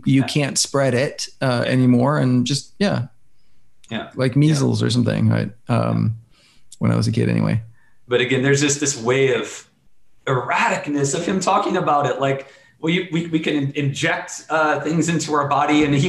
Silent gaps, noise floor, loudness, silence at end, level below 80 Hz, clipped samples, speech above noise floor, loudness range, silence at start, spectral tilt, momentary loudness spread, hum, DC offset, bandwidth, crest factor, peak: none; -57 dBFS; -19 LUFS; 0 s; -54 dBFS; under 0.1%; 39 dB; 1 LU; 0 s; -5 dB/octave; 8 LU; none; 0.1%; 12.5 kHz; 14 dB; -6 dBFS